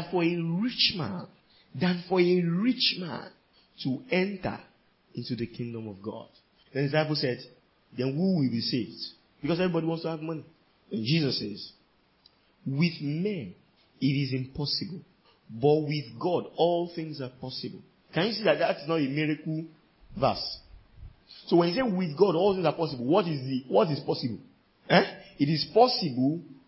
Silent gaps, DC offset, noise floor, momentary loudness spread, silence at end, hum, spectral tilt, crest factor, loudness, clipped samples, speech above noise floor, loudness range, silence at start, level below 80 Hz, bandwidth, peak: none; under 0.1%; -63 dBFS; 16 LU; 0.15 s; none; -9.5 dB/octave; 22 dB; -28 LUFS; under 0.1%; 36 dB; 6 LU; 0 s; -62 dBFS; 5.8 kHz; -6 dBFS